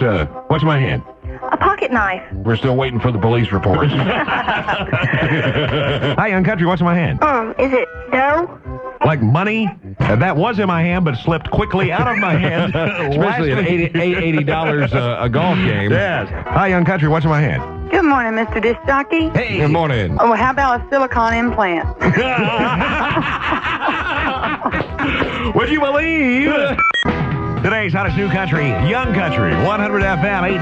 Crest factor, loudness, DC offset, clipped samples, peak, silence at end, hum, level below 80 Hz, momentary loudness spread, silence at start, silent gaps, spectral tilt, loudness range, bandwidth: 14 dB; -16 LUFS; under 0.1%; under 0.1%; -2 dBFS; 0 s; none; -34 dBFS; 4 LU; 0 s; none; -7.5 dB/octave; 1 LU; 8.2 kHz